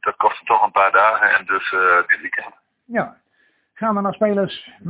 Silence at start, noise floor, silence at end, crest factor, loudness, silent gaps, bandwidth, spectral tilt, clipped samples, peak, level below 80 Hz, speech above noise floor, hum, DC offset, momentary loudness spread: 0.05 s; -62 dBFS; 0 s; 16 dB; -17 LUFS; none; 4 kHz; -8.5 dB/octave; under 0.1%; -2 dBFS; -62 dBFS; 45 dB; none; under 0.1%; 12 LU